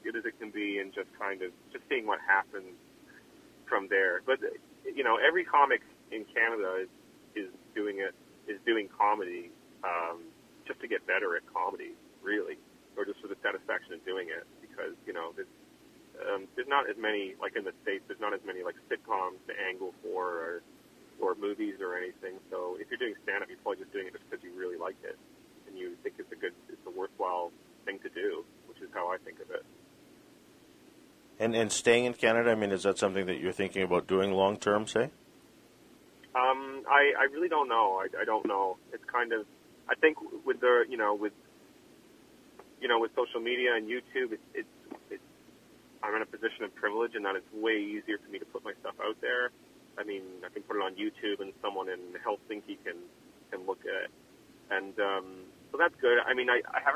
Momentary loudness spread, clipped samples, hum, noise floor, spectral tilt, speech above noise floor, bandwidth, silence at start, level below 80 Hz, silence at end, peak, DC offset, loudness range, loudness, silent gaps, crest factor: 16 LU; under 0.1%; none; -59 dBFS; -3.5 dB/octave; 27 dB; 15 kHz; 0.05 s; -72 dBFS; 0 s; -8 dBFS; under 0.1%; 10 LU; -32 LUFS; none; 26 dB